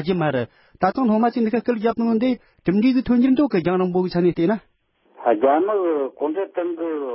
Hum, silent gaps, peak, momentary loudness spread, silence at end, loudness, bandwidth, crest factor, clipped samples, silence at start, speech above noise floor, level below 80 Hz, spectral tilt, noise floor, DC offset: none; none; -6 dBFS; 8 LU; 0 s; -20 LUFS; 5.8 kHz; 16 dB; under 0.1%; 0 s; 30 dB; -54 dBFS; -12 dB/octave; -49 dBFS; under 0.1%